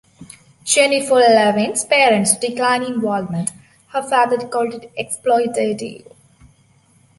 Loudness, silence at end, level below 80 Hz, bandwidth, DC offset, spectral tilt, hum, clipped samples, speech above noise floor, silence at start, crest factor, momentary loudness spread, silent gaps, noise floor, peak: -16 LUFS; 1.2 s; -62 dBFS; 12 kHz; under 0.1%; -3 dB/octave; none; under 0.1%; 38 dB; 0.2 s; 18 dB; 14 LU; none; -54 dBFS; 0 dBFS